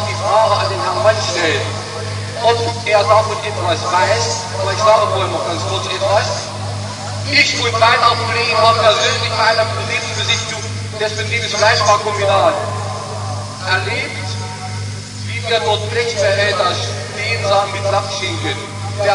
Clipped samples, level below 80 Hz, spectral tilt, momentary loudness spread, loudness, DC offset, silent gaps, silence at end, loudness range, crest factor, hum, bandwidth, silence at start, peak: under 0.1%; -52 dBFS; -3.5 dB/octave; 12 LU; -15 LUFS; under 0.1%; none; 0 s; 5 LU; 16 dB; none; 11 kHz; 0 s; 0 dBFS